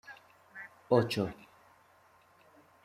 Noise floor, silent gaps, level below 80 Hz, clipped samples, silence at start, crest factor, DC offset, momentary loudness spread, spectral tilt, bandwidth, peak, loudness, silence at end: -64 dBFS; none; -70 dBFS; under 0.1%; 0.1 s; 24 dB; under 0.1%; 25 LU; -6.5 dB/octave; 15.5 kHz; -12 dBFS; -31 LUFS; 1.5 s